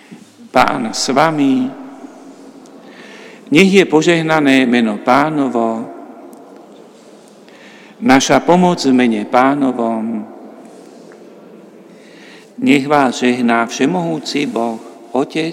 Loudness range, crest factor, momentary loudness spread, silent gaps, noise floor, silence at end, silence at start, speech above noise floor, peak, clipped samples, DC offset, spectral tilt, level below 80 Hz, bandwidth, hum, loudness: 6 LU; 16 dB; 21 LU; none; -41 dBFS; 0 s; 0.1 s; 28 dB; 0 dBFS; 0.1%; under 0.1%; -5 dB/octave; -56 dBFS; 15.5 kHz; none; -14 LUFS